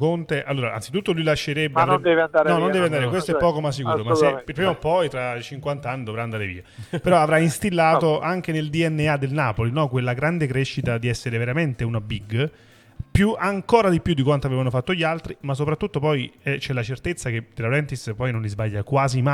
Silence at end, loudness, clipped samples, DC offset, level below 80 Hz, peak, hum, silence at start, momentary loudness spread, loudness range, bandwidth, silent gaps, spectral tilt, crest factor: 0 s; -22 LUFS; under 0.1%; under 0.1%; -46 dBFS; -2 dBFS; none; 0 s; 10 LU; 4 LU; 14 kHz; none; -6.5 dB/octave; 18 dB